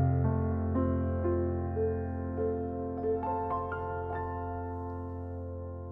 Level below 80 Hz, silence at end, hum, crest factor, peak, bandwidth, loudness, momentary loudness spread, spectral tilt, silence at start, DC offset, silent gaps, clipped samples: -52 dBFS; 0 s; none; 14 dB; -18 dBFS; 3.1 kHz; -33 LUFS; 9 LU; -12.5 dB/octave; 0 s; under 0.1%; none; under 0.1%